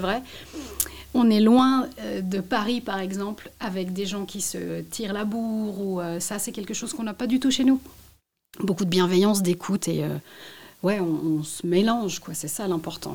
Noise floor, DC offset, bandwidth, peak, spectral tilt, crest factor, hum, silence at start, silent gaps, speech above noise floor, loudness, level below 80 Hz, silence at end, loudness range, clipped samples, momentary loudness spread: -58 dBFS; 0.2%; 18 kHz; -4 dBFS; -5 dB/octave; 20 dB; none; 0 s; none; 33 dB; -25 LUFS; -56 dBFS; 0 s; 6 LU; under 0.1%; 12 LU